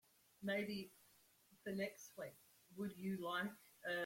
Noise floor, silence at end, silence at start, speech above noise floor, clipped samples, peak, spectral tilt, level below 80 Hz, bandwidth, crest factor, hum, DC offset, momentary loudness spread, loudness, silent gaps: -73 dBFS; 0 s; 0.4 s; 27 dB; under 0.1%; -30 dBFS; -5 dB/octave; -84 dBFS; 16.5 kHz; 18 dB; none; under 0.1%; 12 LU; -47 LUFS; none